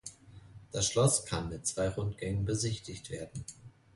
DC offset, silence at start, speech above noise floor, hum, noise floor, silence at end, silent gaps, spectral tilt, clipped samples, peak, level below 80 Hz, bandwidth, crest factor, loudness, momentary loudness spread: under 0.1%; 0.05 s; 20 dB; none; -53 dBFS; 0.25 s; none; -4 dB/octave; under 0.1%; -14 dBFS; -52 dBFS; 11.5 kHz; 20 dB; -33 LUFS; 16 LU